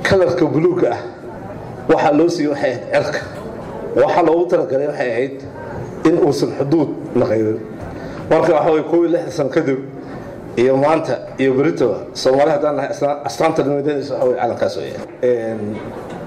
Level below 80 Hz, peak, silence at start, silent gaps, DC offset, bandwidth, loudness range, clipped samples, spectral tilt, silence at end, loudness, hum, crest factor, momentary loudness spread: -48 dBFS; -6 dBFS; 0 s; none; under 0.1%; 12.5 kHz; 2 LU; under 0.1%; -6.5 dB/octave; 0 s; -17 LUFS; none; 12 dB; 15 LU